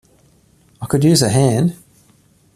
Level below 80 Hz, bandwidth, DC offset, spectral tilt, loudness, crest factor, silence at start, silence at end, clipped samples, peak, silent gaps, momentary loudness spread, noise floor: -48 dBFS; 14.5 kHz; under 0.1%; -5.5 dB/octave; -15 LUFS; 16 dB; 0.8 s; 0.8 s; under 0.1%; -2 dBFS; none; 8 LU; -53 dBFS